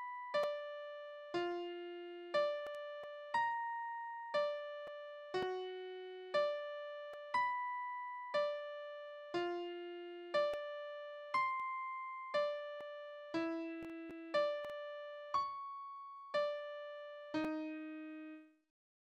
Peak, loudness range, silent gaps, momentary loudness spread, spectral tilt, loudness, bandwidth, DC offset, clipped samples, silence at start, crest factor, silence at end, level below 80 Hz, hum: -24 dBFS; 2 LU; none; 12 LU; -4.5 dB/octave; -42 LUFS; 9.4 kHz; under 0.1%; under 0.1%; 0 s; 18 dB; 0.6 s; -82 dBFS; none